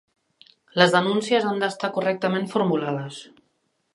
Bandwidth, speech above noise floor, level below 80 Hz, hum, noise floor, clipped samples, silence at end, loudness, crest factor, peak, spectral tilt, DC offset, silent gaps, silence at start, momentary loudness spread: 11.5 kHz; 49 dB; -72 dBFS; none; -71 dBFS; under 0.1%; 0.7 s; -22 LUFS; 24 dB; 0 dBFS; -5 dB/octave; under 0.1%; none; 0.75 s; 13 LU